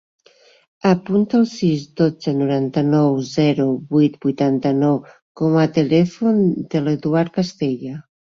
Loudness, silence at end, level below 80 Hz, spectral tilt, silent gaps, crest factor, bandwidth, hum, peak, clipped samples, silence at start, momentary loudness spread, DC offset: -18 LUFS; 0.35 s; -58 dBFS; -7.5 dB/octave; 5.22-5.35 s; 14 dB; 7.4 kHz; none; -4 dBFS; under 0.1%; 0.85 s; 6 LU; under 0.1%